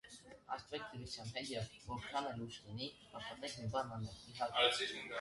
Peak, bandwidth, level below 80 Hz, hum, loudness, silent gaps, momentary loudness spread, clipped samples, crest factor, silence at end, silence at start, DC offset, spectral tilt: -20 dBFS; 11.5 kHz; -66 dBFS; none; -42 LUFS; none; 15 LU; under 0.1%; 24 dB; 0 s; 0.05 s; under 0.1%; -3.5 dB/octave